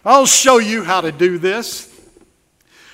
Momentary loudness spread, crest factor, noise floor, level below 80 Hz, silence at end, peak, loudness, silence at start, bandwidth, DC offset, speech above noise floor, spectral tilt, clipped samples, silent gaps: 15 LU; 16 dB; -57 dBFS; -56 dBFS; 1.1 s; 0 dBFS; -13 LUFS; 0.05 s; 16.5 kHz; under 0.1%; 44 dB; -2 dB/octave; under 0.1%; none